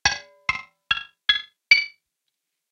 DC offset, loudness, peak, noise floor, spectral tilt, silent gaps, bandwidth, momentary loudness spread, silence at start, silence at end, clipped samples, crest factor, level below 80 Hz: under 0.1%; -21 LUFS; 0 dBFS; -80 dBFS; 0.5 dB/octave; none; 10 kHz; 11 LU; 0.05 s; 0.8 s; under 0.1%; 26 dB; -54 dBFS